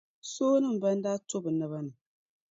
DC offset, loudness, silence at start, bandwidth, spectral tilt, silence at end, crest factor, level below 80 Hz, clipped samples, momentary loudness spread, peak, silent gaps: under 0.1%; -30 LUFS; 0.25 s; 7.8 kHz; -6 dB/octave; 0.6 s; 14 dB; -78 dBFS; under 0.1%; 14 LU; -16 dBFS; none